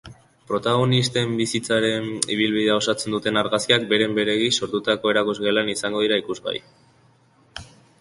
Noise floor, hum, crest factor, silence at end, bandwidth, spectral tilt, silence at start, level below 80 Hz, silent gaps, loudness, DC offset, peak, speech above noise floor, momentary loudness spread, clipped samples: -57 dBFS; none; 20 dB; 0.35 s; 11.5 kHz; -4 dB/octave; 0.05 s; -58 dBFS; none; -21 LUFS; under 0.1%; -2 dBFS; 36 dB; 9 LU; under 0.1%